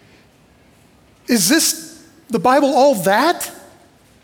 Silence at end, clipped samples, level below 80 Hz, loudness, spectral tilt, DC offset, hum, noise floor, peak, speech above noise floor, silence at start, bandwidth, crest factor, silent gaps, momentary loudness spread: 0.65 s; under 0.1%; -60 dBFS; -15 LUFS; -3 dB/octave; under 0.1%; none; -51 dBFS; -4 dBFS; 36 dB; 1.3 s; 18 kHz; 14 dB; none; 15 LU